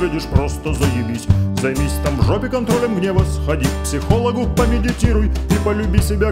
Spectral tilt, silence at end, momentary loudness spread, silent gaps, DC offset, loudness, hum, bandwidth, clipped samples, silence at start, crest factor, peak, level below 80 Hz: -6.5 dB/octave; 0 s; 3 LU; none; under 0.1%; -18 LUFS; none; 16 kHz; under 0.1%; 0 s; 16 dB; 0 dBFS; -22 dBFS